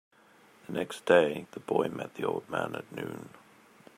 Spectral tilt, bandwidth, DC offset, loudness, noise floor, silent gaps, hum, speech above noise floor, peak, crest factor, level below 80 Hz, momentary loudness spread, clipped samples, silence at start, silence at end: -5.5 dB/octave; 15.5 kHz; under 0.1%; -31 LUFS; -60 dBFS; none; none; 30 dB; -8 dBFS; 24 dB; -74 dBFS; 16 LU; under 0.1%; 0.7 s; 0.7 s